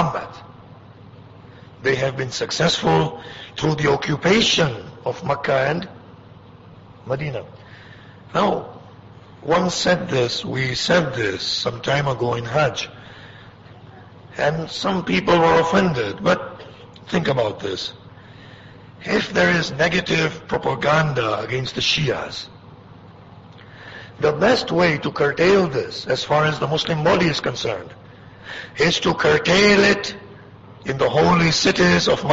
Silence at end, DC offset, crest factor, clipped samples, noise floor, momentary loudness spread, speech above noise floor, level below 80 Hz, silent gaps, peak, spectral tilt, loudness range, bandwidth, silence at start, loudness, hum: 0 s; under 0.1%; 16 dB; under 0.1%; -44 dBFS; 17 LU; 24 dB; -48 dBFS; none; -4 dBFS; -4.5 dB/octave; 6 LU; 8 kHz; 0 s; -19 LUFS; none